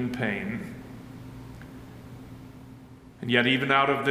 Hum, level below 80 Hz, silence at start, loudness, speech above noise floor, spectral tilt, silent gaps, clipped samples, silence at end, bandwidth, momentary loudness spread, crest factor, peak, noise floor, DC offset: none; -56 dBFS; 0 s; -25 LUFS; 23 dB; -6 dB/octave; none; under 0.1%; 0 s; 16 kHz; 24 LU; 22 dB; -6 dBFS; -48 dBFS; under 0.1%